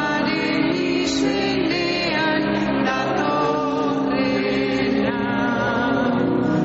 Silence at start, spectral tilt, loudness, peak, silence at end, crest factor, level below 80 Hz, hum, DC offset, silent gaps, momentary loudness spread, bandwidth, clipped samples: 0 s; -3.5 dB/octave; -20 LUFS; -8 dBFS; 0 s; 12 dB; -48 dBFS; none; under 0.1%; none; 1 LU; 8 kHz; under 0.1%